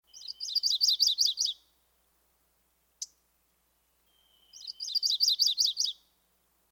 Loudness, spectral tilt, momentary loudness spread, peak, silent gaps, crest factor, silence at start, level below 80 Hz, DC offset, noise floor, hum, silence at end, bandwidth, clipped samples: -26 LUFS; 5 dB/octave; 20 LU; -14 dBFS; none; 20 dB; 0.15 s; -80 dBFS; under 0.1%; -72 dBFS; none; 0.8 s; over 20 kHz; under 0.1%